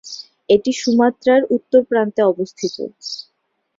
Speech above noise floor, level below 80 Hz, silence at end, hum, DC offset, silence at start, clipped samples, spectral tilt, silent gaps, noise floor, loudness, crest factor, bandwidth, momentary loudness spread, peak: 54 dB; -60 dBFS; 0.55 s; none; under 0.1%; 0.05 s; under 0.1%; -4.5 dB/octave; none; -70 dBFS; -17 LUFS; 16 dB; 7.8 kHz; 14 LU; -2 dBFS